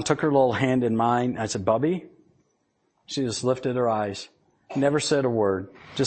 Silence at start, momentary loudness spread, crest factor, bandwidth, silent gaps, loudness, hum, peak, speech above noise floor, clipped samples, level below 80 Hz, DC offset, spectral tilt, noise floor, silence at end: 0 s; 11 LU; 20 dB; 8.8 kHz; none; -24 LUFS; none; -6 dBFS; 47 dB; under 0.1%; -60 dBFS; under 0.1%; -5.5 dB/octave; -71 dBFS; 0 s